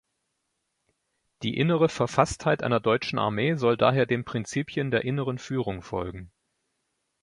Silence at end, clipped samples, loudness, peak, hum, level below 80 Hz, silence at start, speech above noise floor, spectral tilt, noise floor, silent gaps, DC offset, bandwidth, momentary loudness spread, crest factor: 0.95 s; under 0.1%; -26 LUFS; -4 dBFS; none; -54 dBFS; 1.4 s; 53 dB; -6 dB/octave; -78 dBFS; none; under 0.1%; 11.5 kHz; 10 LU; 22 dB